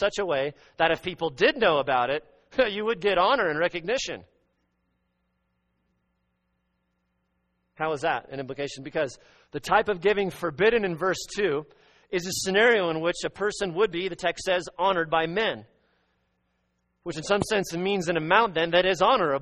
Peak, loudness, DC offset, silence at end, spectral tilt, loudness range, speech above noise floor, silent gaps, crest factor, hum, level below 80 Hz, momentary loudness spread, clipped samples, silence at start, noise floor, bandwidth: -4 dBFS; -25 LUFS; under 0.1%; 0 s; -4 dB/octave; 9 LU; 50 dB; none; 22 dB; none; -56 dBFS; 11 LU; under 0.1%; 0 s; -75 dBFS; 10 kHz